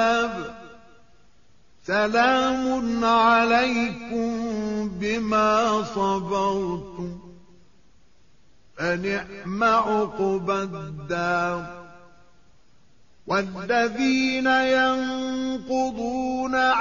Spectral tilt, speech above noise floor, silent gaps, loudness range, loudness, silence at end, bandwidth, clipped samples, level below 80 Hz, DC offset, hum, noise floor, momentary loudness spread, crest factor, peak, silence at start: -3 dB/octave; 37 dB; none; 7 LU; -23 LUFS; 0 s; 7.2 kHz; under 0.1%; -54 dBFS; 0.3%; none; -60 dBFS; 13 LU; 16 dB; -8 dBFS; 0 s